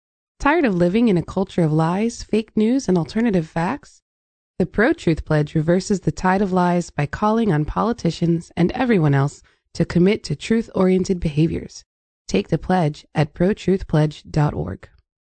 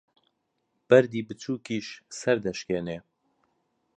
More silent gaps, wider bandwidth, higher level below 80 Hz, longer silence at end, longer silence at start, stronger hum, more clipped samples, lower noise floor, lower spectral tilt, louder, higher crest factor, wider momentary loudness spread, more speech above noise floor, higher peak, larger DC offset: first, 4.02-4.54 s, 11.86-12.25 s vs none; about the same, 9 kHz vs 9.2 kHz; first, -40 dBFS vs -64 dBFS; second, 0.35 s vs 1 s; second, 0.4 s vs 0.9 s; neither; neither; first, under -90 dBFS vs -77 dBFS; first, -7 dB/octave vs -5.5 dB/octave; first, -20 LUFS vs -27 LUFS; second, 14 dB vs 24 dB; second, 6 LU vs 16 LU; first, over 71 dB vs 51 dB; about the same, -4 dBFS vs -4 dBFS; neither